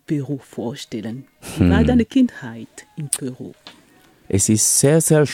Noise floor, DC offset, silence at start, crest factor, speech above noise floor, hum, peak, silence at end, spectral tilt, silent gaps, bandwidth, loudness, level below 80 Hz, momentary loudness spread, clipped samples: -52 dBFS; under 0.1%; 0.1 s; 18 dB; 33 dB; none; -2 dBFS; 0 s; -5 dB/octave; none; 18 kHz; -18 LUFS; -38 dBFS; 20 LU; under 0.1%